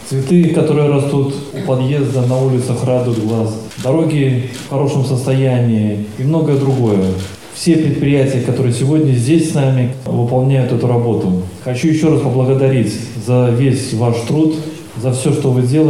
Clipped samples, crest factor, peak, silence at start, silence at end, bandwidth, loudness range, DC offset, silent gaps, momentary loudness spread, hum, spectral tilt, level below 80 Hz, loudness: under 0.1%; 12 dB; 0 dBFS; 0 s; 0 s; 12.5 kHz; 2 LU; 0.4%; none; 7 LU; none; -7.5 dB/octave; -48 dBFS; -14 LUFS